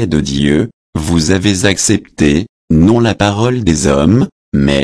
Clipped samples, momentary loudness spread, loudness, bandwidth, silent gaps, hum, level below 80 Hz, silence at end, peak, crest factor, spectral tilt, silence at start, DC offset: under 0.1%; 5 LU; -12 LUFS; 11 kHz; 0.73-0.93 s, 2.49-2.68 s, 4.32-4.52 s; none; -28 dBFS; 0 s; 0 dBFS; 12 dB; -5 dB/octave; 0 s; under 0.1%